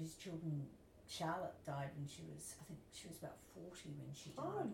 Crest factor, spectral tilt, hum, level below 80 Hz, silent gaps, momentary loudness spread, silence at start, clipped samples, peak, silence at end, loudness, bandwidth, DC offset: 16 dB; -5 dB/octave; none; -74 dBFS; none; 11 LU; 0 s; under 0.1%; -32 dBFS; 0 s; -49 LUFS; 17 kHz; under 0.1%